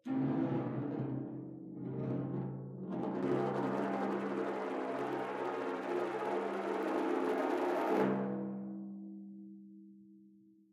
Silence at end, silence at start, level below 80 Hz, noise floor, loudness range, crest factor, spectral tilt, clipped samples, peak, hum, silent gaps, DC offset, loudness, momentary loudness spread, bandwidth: 0.35 s; 0.05 s; -78 dBFS; -63 dBFS; 3 LU; 16 dB; -8 dB/octave; under 0.1%; -20 dBFS; none; none; under 0.1%; -37 LUFS; 13 LU; 14.5 kHz